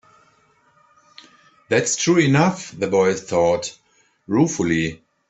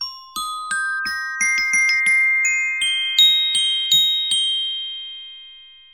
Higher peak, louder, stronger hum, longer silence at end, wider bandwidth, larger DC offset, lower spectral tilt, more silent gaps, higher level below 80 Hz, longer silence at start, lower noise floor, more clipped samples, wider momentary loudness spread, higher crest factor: about the same, -4 dBFS vs -4 dBFS; second, -19 LUFS vs -16 LUFS; neither; about the same, 0.35 s vs 0.25 s; second, 8.4 kHz vs over 20 kHz; neither; first, -5 dB/octave vs 4 dB/octave; neither; about the same, -56 dBFS vs -60 dBFS; first, 1.7 s vs 0 s; first, -59 dBFS vs -44 dBFS; neither; second, 8 LU vs 15 LU; about the same, 18 dB vs 16 dB